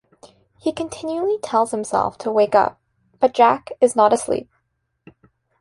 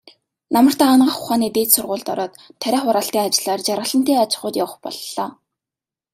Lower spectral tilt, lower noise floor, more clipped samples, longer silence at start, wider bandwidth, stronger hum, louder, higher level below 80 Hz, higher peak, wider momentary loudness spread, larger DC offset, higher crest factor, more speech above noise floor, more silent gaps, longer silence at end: first, -4.5 dB/octave vs -3 dB/octave; second, -71 dBFS vs -89 dBFS; neither; first, 0.65 s vs 0.5 s; second, 11.5 kHz vs 16 kHz; neither; about the same, -19 LUFS vs -18 LUFS; first, -58 dBFS vs -64 dBFS; about the same, -2 dBFS vs 0 dBFS; about the same, 11 LU vs 13 LU; neither; about the same, 18 dB vs 18 dB; second, 53 dB vs 71 dB; neither; first, 1.15 s vs 0.8 s